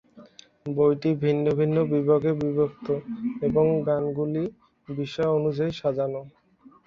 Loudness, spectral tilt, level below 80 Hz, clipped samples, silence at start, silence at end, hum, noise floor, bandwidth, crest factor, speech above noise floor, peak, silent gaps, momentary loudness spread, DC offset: -25 LUFS; -9 dB/octave; -60 dBFS; under 0.1%; 0.15 s; 0.6 s; none; -51 dBFS; 6.8 kHz; 16 dB; 27 dB; -8 dBFS; none; 10 LU; under 0.1%